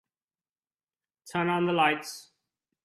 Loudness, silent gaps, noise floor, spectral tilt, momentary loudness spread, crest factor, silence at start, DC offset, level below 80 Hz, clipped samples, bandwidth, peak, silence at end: -27 LUFS; none; under -90 dBFS; -5 dB/octave; 16 LU; 20 dB; 1.25 s; under 0.1%; -74 dBFS; under 0.1%; 14 kHz; -12 dBFS; 0.65 s